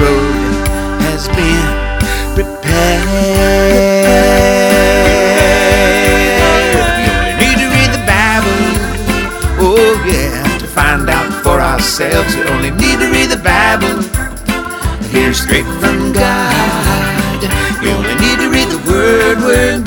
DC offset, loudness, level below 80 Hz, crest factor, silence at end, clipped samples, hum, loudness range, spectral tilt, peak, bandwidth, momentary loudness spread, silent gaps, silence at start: under 0.1%; -11 LUFS; -20 dBFS; 10 dB; 0 s; 0.6%; none; 4 LU; -4.5 dB/octave; 0 dBFS; over 20 kHz; 7 LU; none; 0 s